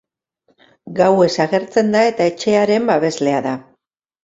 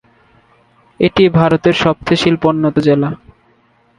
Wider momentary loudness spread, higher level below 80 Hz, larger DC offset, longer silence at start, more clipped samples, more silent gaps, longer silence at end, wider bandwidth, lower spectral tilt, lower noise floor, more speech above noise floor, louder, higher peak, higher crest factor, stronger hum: about the same, 8 LU vs 6 LU; second, -60 dBFS vs -44 dBFS; neither; second, 0.85 s vs 1 s; neither; neither; second, 0.65 s vs 0.85 s; second, 8 kHz vs 10.5 kHz; second, -5.5 dB/octave vs -7 dB/octave; first, -68 dBFS vs -54 dBFS; first, 53 dB vs 42 dB; second, -16 LUFS vs -13 LUFS; about the same, -2 dBFS vs 0 dBFS; about the same, 16 dB vs 14 dB; neither